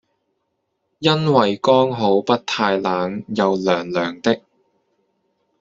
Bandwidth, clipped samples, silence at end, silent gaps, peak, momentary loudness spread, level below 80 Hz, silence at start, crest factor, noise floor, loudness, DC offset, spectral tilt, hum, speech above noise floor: 7.8 kHz; under 0.1%; 1.2 s; none; -2 dBFS; 7 LU; -60 dBFS; 1 s; 18 dB; -73 dBFS; -18 LUFS; under 0.1%; -6 dB/octave; none; 55 dB